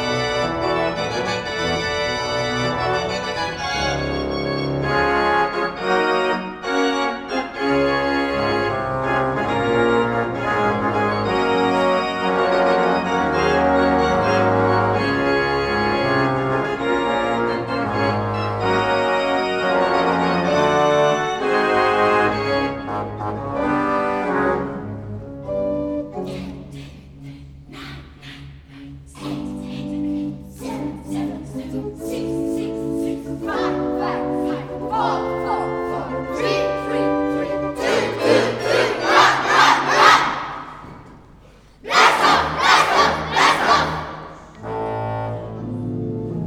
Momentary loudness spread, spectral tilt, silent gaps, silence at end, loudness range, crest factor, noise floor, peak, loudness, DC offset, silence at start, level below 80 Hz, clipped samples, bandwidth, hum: 14 LU; -5 dB/octave; none; 0 s; 12 LU; 20 dB; -47 dBFS; 0 dBFS; -19 LUFS; under 0.1%; 0 s; -44 dBFS; under 0.1%; 17 kHz; none